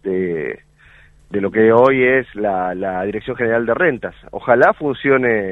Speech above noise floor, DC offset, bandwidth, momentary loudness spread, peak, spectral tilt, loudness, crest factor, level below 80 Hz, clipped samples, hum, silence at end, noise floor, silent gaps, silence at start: 32 dB; under 0.1%; 6.2 kHz; 15 LU; 0 dBFS; -8.5 dB/octave; -16 LUFS; 16 dB; -50 dBFS; under 0.1%; none; 0 s; -48 dBFS; none; 0.05 s